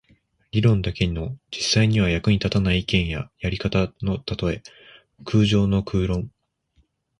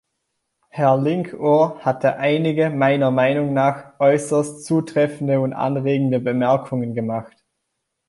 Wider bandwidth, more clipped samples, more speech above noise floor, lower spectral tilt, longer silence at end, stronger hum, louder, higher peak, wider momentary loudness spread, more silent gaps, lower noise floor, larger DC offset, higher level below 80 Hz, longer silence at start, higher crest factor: about the same, 11 kHz vs 11.5 kHz; neither; second, 43 dB vs 58 dB; about the same, -6 dB/octave vs -7 dB/octave; about the same, 0.9 s vs 0.8 s; neither; second, -22 LUFS vs -19 LUFS; about the same, -6 dBFS vs -4 dBFS; first, 10 LU vs 6 LU; neither; second, -65 dBFS vs -77 dBFS; neither; first, -38 dBFS vs -64 dBFS; second, 0.55 s vs 0.75 s; about the same, 18 dB vs 16 dB